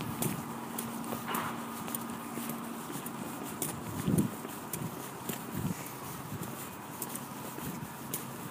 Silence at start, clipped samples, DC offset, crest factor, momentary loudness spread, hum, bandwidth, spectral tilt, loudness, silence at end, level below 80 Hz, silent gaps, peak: 0 s; under 0.1%; under 0.1%; 22 dB; 6 LU; none; 15.5 kHz; -4.5 dB/octave; -38 LUFS; 0 s; -64 dBFS; none; -14 dBFS